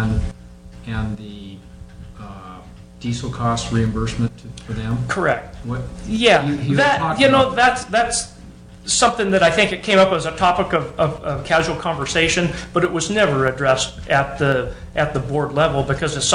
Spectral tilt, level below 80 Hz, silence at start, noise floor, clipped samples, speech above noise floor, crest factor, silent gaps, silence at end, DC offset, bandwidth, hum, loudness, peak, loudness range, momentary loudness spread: -4 dB/octave; -36 dBFS; 0 s; -40 dBFS; under 0.1%; 21 dB; 16 dB; none; 0 s; under 0.1%; 10.5 kHz; none; -18 LUFS; -2 dBFS; 8 LU; 16 LU